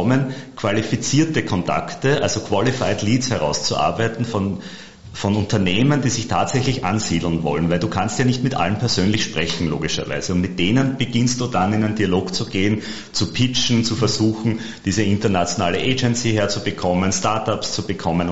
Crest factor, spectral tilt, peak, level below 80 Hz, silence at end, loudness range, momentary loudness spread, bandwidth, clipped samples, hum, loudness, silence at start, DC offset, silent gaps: 16 dB; -5 dB/octave; -4 dBFS; -44 dBFS; 0 s; 1 LU; 5 LU; 8 kHz; under 0.1%; none; -20 LUFS; 0 s; 2%; none